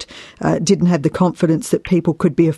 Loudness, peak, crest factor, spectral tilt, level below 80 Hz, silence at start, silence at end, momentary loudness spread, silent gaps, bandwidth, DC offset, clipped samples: -17 LUFS; -2 dBFS; 14 dB; -6.5 dB/octave; -48 dBFS; 0 s; 0 s; 5 LU; none; 12.5 kHz; under 0.1%; under 0.1%